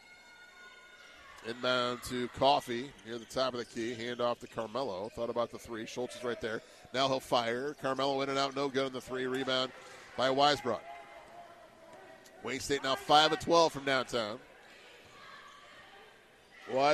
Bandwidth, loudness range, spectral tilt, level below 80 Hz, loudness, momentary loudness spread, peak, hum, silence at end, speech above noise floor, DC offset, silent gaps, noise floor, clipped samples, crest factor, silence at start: 13 kHz; 6 LU; -3.5 dB/octave; -66 dBFS; -33 LUFS; 25 LU; -10 dBFS; none; 0 s; 27 dB; under 0.1%; none; -59 dBFS; under 0.1%; 24 dB; 0.1 s